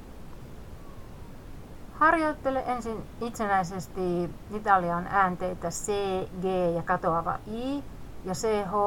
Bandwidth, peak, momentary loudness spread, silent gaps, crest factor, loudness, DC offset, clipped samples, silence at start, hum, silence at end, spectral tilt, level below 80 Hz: 18.5 kHz; -8 dBFS; 22 LU; none; 22 dB; -28 LUFS; under 0.1%; under 0.1%; 0 s; none; 0 s; -5.5 dB/octave; -46 dBFS